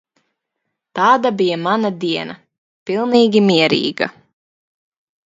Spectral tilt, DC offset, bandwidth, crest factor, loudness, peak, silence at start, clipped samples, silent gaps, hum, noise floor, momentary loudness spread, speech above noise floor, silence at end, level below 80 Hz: -5.5 dB/octave; under 0.1%; 7.8 kHz; 18 dB; -16 LUFS; 0 dBFS; 0.95 s; under 0.1%; 2.58-2.86 s; none; -76 dBFS; 11 LU; 61 dB; 1.15 s; -62 dBFS